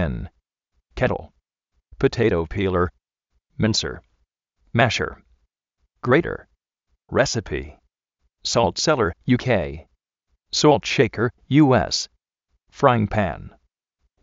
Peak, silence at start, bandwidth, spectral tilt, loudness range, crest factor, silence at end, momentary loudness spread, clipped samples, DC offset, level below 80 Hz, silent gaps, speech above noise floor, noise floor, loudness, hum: 0 dBFS; 0 s; 8 kHz; -4.5 dB/octave; 5 LU; 22 dB; 0.75 s; 14 LU; under 0.1%; under 0.1%; -42 dBFS; none; 53 dB; -73 dBFS; -21 LUFS; none